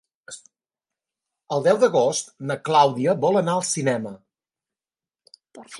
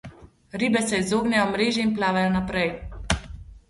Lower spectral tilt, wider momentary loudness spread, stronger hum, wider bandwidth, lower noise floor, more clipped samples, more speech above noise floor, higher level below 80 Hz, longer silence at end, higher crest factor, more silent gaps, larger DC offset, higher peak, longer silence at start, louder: about the same, -4.5 dB/octave vs -4.5 dB/octave; first, 22 LU vs 7 LU; neither; about the same, 11.5 kHz vs 11.5 kHz; first, under -90 dBFS vs -45 dBFS; neither; first, over 69 dB vs 23 dB; second, -74 dBFS vs -42 dBFS; about the same, 0 s vs 0.1 s; about the same, 20 dB vs 22 dB; neither; neither; about the same, -4 dBFS vs -4 dBFS; first, 0.3 s vs 0.05 s; about the same, -21 LUFS vs -23 LUFS